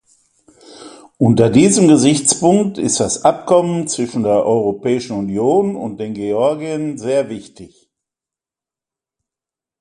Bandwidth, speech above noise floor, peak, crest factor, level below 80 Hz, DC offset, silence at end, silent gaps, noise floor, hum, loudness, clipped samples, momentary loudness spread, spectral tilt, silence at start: 11.5 kHz; 74 dB; 0 dBFS; 16 dB; -52 dBFS; under 0.1%; 2.15 s; none; -89 dBFS; none; -15 LUFS; under 0.1%; 11 LU; -5 dB/octave; 0.7 s